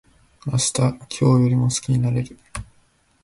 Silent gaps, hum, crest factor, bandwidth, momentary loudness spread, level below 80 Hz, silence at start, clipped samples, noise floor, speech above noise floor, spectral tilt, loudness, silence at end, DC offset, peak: none; none; 14 dB; 11.5 kHz; 18 LU; -46 dBFS; 0.45 s; under 0.1%; -60 dBFS; 40 dB; -5.5 dB/octave; -20 LUFS; 0.6 s; under 0.1%; -6 dBFS